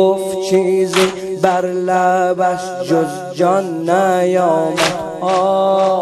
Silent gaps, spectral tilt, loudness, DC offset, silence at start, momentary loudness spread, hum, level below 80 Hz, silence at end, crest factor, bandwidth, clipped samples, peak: none; -5 dB/octave; -15 LUFS; under 0.1%; 0 s; 4 LU; none; -56 dBFS; 0 s; 14 dB; 13 kHz; under 0.1%; 0 dBFS